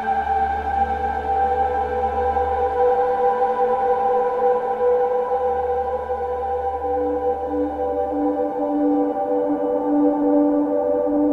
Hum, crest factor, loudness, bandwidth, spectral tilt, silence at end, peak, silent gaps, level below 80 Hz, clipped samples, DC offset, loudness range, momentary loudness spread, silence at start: none; 12 dB; -21 LUFS; 4.7 kHz; -8.5 dB/octave; 0 s; -8 dBFS; none; -40 dBFS; under 0.1%; under 0.1%; 3 LU; 5 LU; 0 s